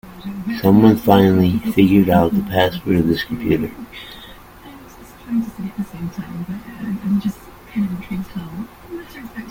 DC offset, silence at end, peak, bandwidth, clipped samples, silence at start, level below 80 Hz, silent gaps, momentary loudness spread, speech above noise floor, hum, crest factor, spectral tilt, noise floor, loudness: under 0.1%; 0 s; 0 dBFS; 17 kHz; under 0.1%; 0.05 s; -44 dBFS; none; 21 LU; 23 dB; none; 18 dB; -7.5 dB/octave; -40 dBFS; -18 LUFS